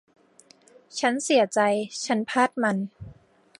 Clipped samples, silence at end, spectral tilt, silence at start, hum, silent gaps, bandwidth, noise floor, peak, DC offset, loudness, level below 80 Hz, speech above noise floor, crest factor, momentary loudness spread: under 0.1%; 0.5 s; -4 dB/octave; 0.95 s; none; none; 11.5 kHz; -57 dBFS; -6 dBFS; under 0.1%; -24 LUFS; -62 dBFS; 33 dB; 20 dB; 9 LU